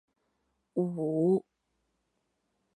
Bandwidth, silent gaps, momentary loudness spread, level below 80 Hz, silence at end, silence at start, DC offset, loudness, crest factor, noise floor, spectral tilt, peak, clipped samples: 10.5 kHz; none; 7 LU; -78 dBFS; 1.35 s; 0.75 s; under 0.1%; -31 LUFS; 18 dB; -79 dBFS; -11.5 dB/octave; -16 dBFS; under 0.1%